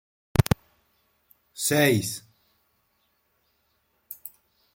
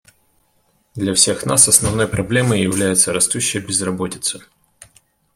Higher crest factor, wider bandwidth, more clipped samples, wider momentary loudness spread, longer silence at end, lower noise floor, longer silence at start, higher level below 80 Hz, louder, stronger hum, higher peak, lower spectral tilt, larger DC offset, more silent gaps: first, 28 dB vs 18 dB; about the same, 16.5 kHz vs 16.5 kHz; neither; first, 23 LU vs 12 LU; second, 0.45 s vs 0.95 s; first, -71 dBFS vs -61 dBFS; second, 0.4 s vs 0.95 s; about the same, -48 dBFS vs -46 dBFS; second, -25 LUFS vs -15 LUFS; neither; about the same, -2 dBFS vs 0 dBFS; first, -4.5 dB/octave vs -3 dB/octave; neither; neither